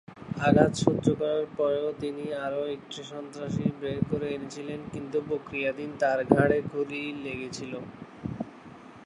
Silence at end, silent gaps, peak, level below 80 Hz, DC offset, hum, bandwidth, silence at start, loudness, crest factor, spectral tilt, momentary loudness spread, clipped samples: 0 s; none; -2 dBFS; -56 dBFS; under 0.1%; none; 11 kHz; 0.1 s; -29 LUFS; 26 dB; -6.5 dB/octave; 16 LU; under 0.1%